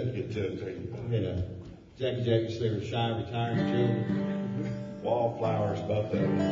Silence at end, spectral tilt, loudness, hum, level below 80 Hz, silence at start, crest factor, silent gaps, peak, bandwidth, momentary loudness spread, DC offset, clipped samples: 0 s; -8 dB/octave; -31 LUFS; none; -56 dBFS; 0 s; 16 dB; none; -14 dBFS; 7.4 kHz; 8 LU; under 0.1%; under 0.1%